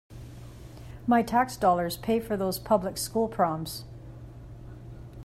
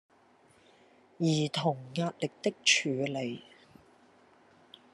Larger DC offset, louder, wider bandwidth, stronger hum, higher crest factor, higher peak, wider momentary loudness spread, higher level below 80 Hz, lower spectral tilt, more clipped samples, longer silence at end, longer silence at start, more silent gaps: neither; first, -27 LUFS vs -30 LUFS; first, 16 kHz vs 11.5 kHz; neither; about the same, 20 dB vs 24 dB; about the same, -10 dBFS vs -10 dBFS; first, 21 LU vs 11 LU; first, -50 dBFS vs -78 dBFS; first, -5 dB/octave vs -3.5 dB/octave; neither; second, 0 s vs 1.55 s; second, 0.1 s vs 1.2 s; neither